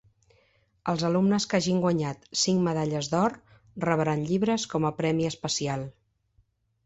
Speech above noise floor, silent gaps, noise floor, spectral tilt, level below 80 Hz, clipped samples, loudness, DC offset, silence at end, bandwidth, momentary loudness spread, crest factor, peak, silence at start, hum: 42 dB; none; -68 dBFS; -5 dB/octave; -60 dBFS; under 0.1%; -27 LUFS; under 0.1%; 0.95 s; 8.2 kHz; 8 LU; 18 dB; -10 dBFS; 0.85 s; none